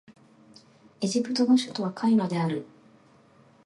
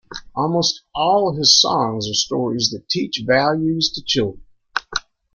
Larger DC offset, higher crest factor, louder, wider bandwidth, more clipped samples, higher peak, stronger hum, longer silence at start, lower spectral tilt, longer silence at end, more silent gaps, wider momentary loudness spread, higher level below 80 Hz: neither; about the same, 18 dB vs 18 dB; second, -26 LUFS vs -18 LUFS; about the same, 11.5 kHz vs 12 kHz; neither; second, -10 dBFS vs 0 dBFS; neither; about the same, 0.1 s vs 0.1 s; first, -5.5 dB/octave vs -3 dB/octave; first, 1 s vs 0.35 s; neither; second, 9 LU vs 14 LU; second, -76 dBFS vs -50 dBFS